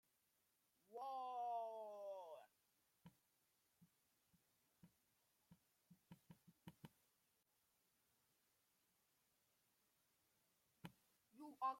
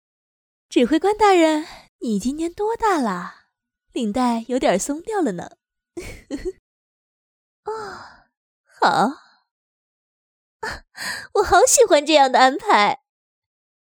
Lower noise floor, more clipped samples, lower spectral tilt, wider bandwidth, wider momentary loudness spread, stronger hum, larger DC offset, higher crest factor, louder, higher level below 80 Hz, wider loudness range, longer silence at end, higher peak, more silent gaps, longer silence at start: first, -85 dBFS vs -69 dBFS; neither; first, -5.5 dB/octave vs -3 dB/octave; second, 16.5 kHz vs over 20 kHz; about the same, 20 LU vs 20 LU; neither; neither; about the same, 24 dB vs 20 dB; second, -52 LUFS vs -18 LUFS; second, under -90 dBFS vs -50 dBFS; about the same, 13 LU vs 12 LU; second, 0 s vs 0.95 s; second, -34 dBFS vs -2 dBFS; second, none vs 1.89-1.99 s, 6.59-7.63 s, 8.37-8.64 s, 9.51-10.60 s; first, 0.9 s vs 0.7 s